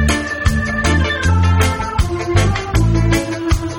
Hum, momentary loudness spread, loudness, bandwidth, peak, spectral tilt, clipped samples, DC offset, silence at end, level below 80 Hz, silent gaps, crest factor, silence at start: none; 5 LU; -16 LUFS; 17.5 kHz; 0 dBFS; -5.5 dB/octave; under 0.1%; under 0.1%; 0 s; -22 dBFS; none; 14 dB; 0 s